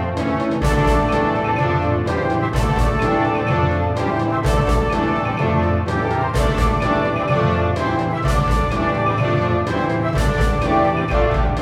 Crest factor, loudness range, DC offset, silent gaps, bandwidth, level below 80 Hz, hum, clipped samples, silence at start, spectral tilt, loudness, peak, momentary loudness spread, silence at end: 14 dB; 1 LU; under 0.1%; none; 14 kHz; -26 dBFS; none; under 0.1%; 0 s; -7 dB/octave; -19 LUFS; -4 dBFS; 3 LU; 0 s